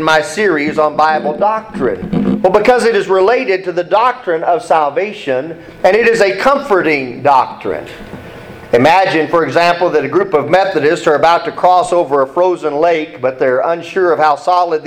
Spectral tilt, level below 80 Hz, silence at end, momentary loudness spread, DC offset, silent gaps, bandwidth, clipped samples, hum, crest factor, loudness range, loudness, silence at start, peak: -5 dB/octave; -46 dBFS; 0 s; 8 LU; under 0.1%; none; 14 kHz; under 0.1%; none; 12 dB; 2 LU; -12 LUFS; 0 s; 0 dBFS